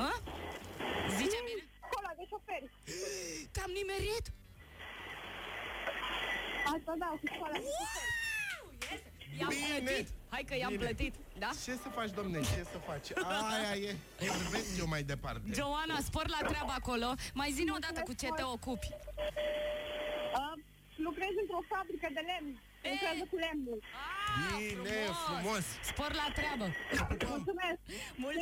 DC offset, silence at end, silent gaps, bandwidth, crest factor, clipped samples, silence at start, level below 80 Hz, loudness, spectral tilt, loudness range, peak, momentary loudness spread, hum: under 0.1%; 0 s; none; 16.5 kHz; 16 dB; under 0.1%; 0 s; -52 dBFS; -38 LUFS; -3.5 dB/octave; 3 LU; -24 dBFS; 8 LU; none